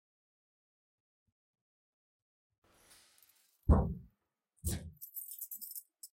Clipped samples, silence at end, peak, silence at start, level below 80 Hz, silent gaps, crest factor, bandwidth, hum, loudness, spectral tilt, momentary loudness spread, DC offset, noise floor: under 0.1%; 0.05 s; -14 dBFS; 3.65 s; -44 dBFS; none; 26 dB; 16.5 kHz; none; -38 LUFS; -6.5 dB/octave; 15 LU; under 0.1%; -80 dBFS